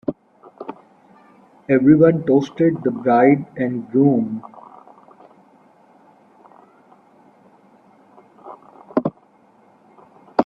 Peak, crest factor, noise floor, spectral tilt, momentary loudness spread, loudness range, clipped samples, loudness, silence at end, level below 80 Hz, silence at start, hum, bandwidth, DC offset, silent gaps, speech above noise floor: 0 dBFS; 20 dB; -54 dBFS; -9.5 dB/octave; 25 LU; 16 LU; under 0.1%; -17 LUFS; 0 s; -60 dBFS; 0.1 s; none; 6.6 kHz; under 0.1%; none; 38 dB